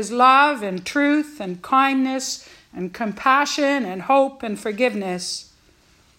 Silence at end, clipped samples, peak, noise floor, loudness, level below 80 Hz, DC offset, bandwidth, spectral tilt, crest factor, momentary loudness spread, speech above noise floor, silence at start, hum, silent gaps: 0.75 s; under 0.1%; -2 dBFS; -56 dBFS; -20 LUFS; -62 dBFS; under 0.1%; 16 kHz; -3.5 dB/octave; 20 dB; 15 LU; 36 dB; 0 s; none; none